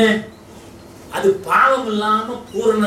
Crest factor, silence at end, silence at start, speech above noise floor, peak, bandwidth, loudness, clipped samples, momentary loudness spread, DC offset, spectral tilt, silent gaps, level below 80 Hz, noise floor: 16 dB; 0 s; 0 s; 23 dB; -2 dBFS; 15.5 kHz; -17 LUFS; under 0.1%; 12 LU; under 0.1%; -5 dB/octave; none; -52 dBFS; -40 dBFS